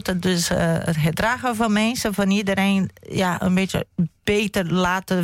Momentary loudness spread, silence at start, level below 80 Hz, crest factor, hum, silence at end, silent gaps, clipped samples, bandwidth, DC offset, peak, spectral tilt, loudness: 4 LU; 0.05 s; -44 dBFS; 12 dB; none; 0 s; none; under 0.1%; 16.5 kHz; under 0.1%; -10 dBFS; -5 dB/octave; -21 LUFS